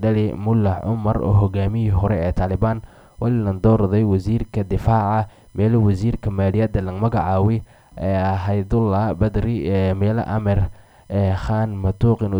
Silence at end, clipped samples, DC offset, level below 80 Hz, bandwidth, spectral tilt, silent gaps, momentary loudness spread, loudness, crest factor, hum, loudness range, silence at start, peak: 0 s; under 0.1%; under 0.1%; -34 dBFS; 5.8 kHz; -10 dB/octave; none; 5 LU; -20 LUFS; 14 dB; none; 1 LU; 0 s; -4 dBFS